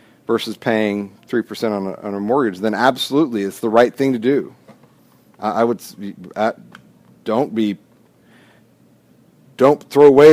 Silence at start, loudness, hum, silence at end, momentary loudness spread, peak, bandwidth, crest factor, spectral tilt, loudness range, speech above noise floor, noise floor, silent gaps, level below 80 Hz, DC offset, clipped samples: 0.3 s; -18 LUFS; none; 0 s; 12 LU; 0 dBFS; 15.5 kHz; 18 dB; -6 dB/octave; 7 LU; 37 dB; -53 dBFS; none; -62 dBFS; under 0.1%; under 0.1%